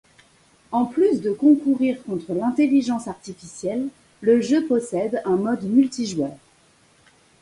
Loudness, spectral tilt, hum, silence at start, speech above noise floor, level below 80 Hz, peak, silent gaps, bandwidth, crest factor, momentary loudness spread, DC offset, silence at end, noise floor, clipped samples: -21 LUFS; -6 dB/octave; none; 0.7 s; 37 dB; -62 dBFS; -6 dBFS; none; 11.5 kHz; 16 dB; 11 LU; under 0.1%; 1.05 s; -57 dBFS; under 0.1%